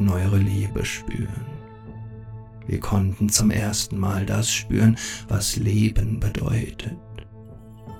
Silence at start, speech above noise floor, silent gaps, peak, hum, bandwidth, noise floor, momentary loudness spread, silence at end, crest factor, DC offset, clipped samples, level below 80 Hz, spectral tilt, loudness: 0 s; 20 dB; none; -4 dBFS; none; 18 kHz; -42 dBFS; 21 LU; 0 s; 20 dB; 0.1%; under 0.1%; -36 dBFS; -5 dB/octave; -23 LUFS